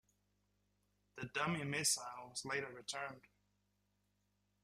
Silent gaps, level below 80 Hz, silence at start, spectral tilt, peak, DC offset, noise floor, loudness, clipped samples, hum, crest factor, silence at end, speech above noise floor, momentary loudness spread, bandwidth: none; -78 dBFS; 1.15 s; -2.5 dB/octave; -22 dBFS; under 0.1%; -82 dBFS; -40 LUFS; under 0.1%; 50 Hz at -70 dBFS; 22 dB; 1.45 s; 40 dB; 15 LU; 14.5 kHz